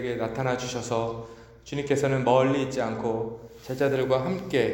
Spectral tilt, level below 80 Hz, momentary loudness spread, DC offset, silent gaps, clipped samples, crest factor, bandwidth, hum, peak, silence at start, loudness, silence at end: -6 dB/octave; -56 dBFS; 15 LU; under 0.1%; none; under 0.1%; 18 dB; 17 kHz; none; -8 dBFS; 0 s; -27 LUFS; 0 s